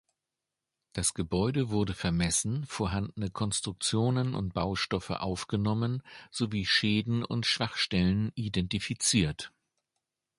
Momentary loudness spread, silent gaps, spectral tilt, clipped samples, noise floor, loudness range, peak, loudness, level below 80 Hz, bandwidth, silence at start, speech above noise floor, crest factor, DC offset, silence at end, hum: 8 LU; none; -4 dB/octave; under 0.1%; -88 dBFS; 3 LU; -12 dBFS; -30 LUFS; -50 dBFS; 11.5 kHz; 0.95 s; 58 dB; 18 dB; under 0.1%; 0.9 s; none